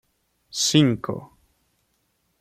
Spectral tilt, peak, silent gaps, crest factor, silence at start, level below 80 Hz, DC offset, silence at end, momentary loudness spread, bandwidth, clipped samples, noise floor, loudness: -4 dB/octave; -6 dBFS; none; 20 dB; 0.55 s; -60 dBFS; under 0.1%; 1.15 s; 16 LU; 15.5 kHz; under 0.1%; -70 dBFS; -21 LUFS